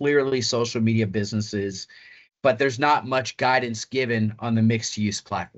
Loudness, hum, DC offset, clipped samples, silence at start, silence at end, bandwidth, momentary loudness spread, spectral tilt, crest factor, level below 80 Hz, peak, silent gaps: -23 LUFS; none; under 0.1%; under 0.1%; 0 s; 0.1 s; 8.2 kHz; 7 LU; -5 dB/octave; 16 dB; -62 dBFS; -6 dBFS; none